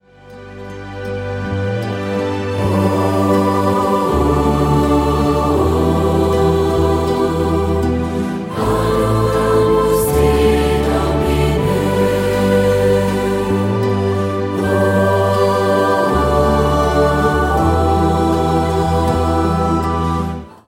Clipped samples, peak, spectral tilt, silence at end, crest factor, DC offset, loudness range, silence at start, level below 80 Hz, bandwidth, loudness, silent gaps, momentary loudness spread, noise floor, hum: under 0.1%; -2 dBFS; -7 dB/octave; 0.2 s; 14 dB; under 0.1%; 2 LU; 0.25 s; -26 dBFS; 16.5 kHz; -15 LUFS; none; 6 LU; -37 dBFS; none